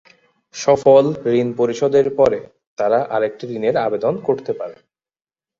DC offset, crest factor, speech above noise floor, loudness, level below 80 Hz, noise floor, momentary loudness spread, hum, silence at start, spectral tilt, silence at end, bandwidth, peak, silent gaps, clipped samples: under 0.1%; 16 dB; over 73 dB; -18 LUFS; -58 dBFS; under -90 dBFS; 14 LU; none; 0.55 s; -6 dB/octave; 0.85 s; 7.6 kHz; -2 dBFS; 2.67-2.77 s; under 0.1%